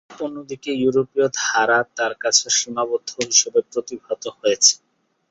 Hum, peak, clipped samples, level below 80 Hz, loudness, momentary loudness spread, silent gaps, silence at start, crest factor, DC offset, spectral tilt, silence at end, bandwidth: none; 0 dBFS; under 0.1%; -66 dBFS; -19 LUFS; 14 LU; none; 0.1 s; 20 dB; under 0.1%; -1 dB/octave; 0.55 s; 8.4 kHz